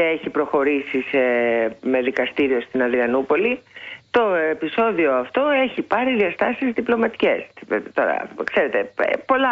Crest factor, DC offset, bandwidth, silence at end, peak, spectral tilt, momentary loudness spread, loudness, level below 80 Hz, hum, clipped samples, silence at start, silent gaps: 14 dB; under 0.1%; 7.2 kHz; 0 s; -6 dBFS; -6.5 dB/octave; 4 LU; -20 LUFS; -60 dBFS; none; under 0.1%; 0 s; none